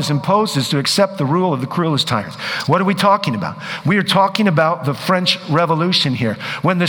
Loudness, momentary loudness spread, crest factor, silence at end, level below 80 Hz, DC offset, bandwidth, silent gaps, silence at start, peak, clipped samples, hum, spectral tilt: -16 LUFS; 7 LU; 16 dB; 0 s; -56 dBFS; under 0.1%; over 20 kHz; none; 0 s; 0 dBFS; under 0.1%; none; -5 dB/octave